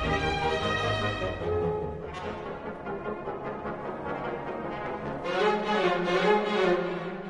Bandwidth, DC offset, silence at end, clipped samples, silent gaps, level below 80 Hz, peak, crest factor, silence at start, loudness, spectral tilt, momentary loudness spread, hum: 10.5 kHz; under 0.1%; 0 s; under 0.1%; none; -48 dBFS; -10 dBFS; 18 dB; 0 s; -29 LUFS; -6 dB/octave; 11 LU; none